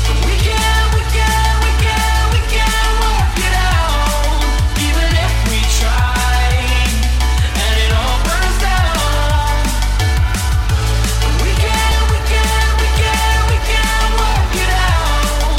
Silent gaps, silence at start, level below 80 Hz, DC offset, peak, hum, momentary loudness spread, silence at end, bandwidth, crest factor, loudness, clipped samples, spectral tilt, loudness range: none; 0 s; -14 dBFS; under 0.1%; 0 dBFS; none; 2 LU; 0 s; 16.5 kHz; 12 dB; -15 LUFS; under 0.1%; -4 dB/octave; 1 LU